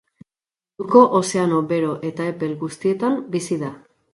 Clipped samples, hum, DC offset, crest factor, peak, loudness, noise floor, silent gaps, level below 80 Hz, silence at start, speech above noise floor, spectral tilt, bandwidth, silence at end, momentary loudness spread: under 0.1%; none; under 0.1%; 20 dB; -2 dBFS; -20 LUFS; under -90 dBFS; none; -66 dBFS; 0.8 s; over 71 dB; -6 dB/octave; 11.5 kHz; 0.35 s; 12 LU